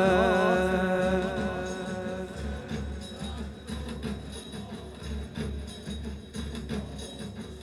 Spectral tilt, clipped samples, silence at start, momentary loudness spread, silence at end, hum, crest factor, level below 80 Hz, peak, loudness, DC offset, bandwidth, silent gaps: -6 dB/octave; under 0.1%; 0 s; 15 LU; 0 s; none; 20 dB; -42 dBFS; -10 dBFS; -32 LUFS; under 0.1%; 13.5 kHz; none